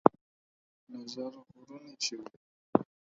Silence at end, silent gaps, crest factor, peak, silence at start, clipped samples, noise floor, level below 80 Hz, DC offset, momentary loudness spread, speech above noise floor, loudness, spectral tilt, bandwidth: 0.3 s; 0.21-0.87 s, 2.36-2.73 s; 34 dB; 0 dBFS; 0.05 s; under 0.1%; under -90 dBFS; -76 dBFS; under 0.1%; 20 LU; over 48 dB; -34 LUFS; -4.5 dB/octave; 7.4 kHz